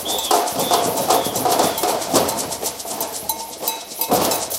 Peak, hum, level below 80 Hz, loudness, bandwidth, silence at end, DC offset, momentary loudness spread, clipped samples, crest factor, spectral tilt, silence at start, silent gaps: 0 dBFS; none; -54 dBFS; -19 LUFS; 17 kHz; 0 s; under 0.1%; 7 LU; under 0.1%; 20 dB; -2 dB/octave; 0 s; none